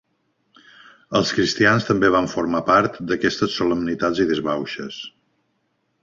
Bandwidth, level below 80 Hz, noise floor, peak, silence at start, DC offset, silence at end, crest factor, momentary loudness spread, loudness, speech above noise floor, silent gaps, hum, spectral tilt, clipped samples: 7.6 kHz; -52 dBFS; -70 dBFS; -2 dBFS; 1.1 s; under 0.1%; 0.95 s; 20 dB; 12 LU; -20 LUFS; 50 dB; none; none; -5 dB/octave; under 0.1%